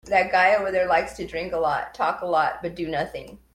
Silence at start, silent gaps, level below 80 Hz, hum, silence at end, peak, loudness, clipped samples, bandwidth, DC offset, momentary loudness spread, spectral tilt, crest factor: 0.05 s; none; -52 dBFS; none; 0.2 s; -6 dBFS; -23 LUFS; under 0.1%; 14 kHz; under 0.1%; 12 LU; -5 dB/octave; 18 dB